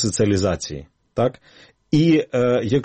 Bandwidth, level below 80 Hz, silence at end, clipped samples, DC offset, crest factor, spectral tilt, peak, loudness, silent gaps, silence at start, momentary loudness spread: 8.8 kHz; -46 dBFS; 0 s; under 0.1%; under 0.1%; 14 dB; -6 dB/octave; -6 dBFS; -20 LUFS; none; 0 s; 14 LU